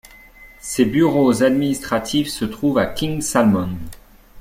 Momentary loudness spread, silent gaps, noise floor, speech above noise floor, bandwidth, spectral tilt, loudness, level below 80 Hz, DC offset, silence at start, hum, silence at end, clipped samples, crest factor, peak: 12 LU; none; -44 dBFS; 26 dB; 16.5 kHz; -5 dB/octave; -18 LUFS; -44 dBFS; under 0.1%; 0.4 s; none; 0 s; under 0.1%; 16 dB; -2 dBFS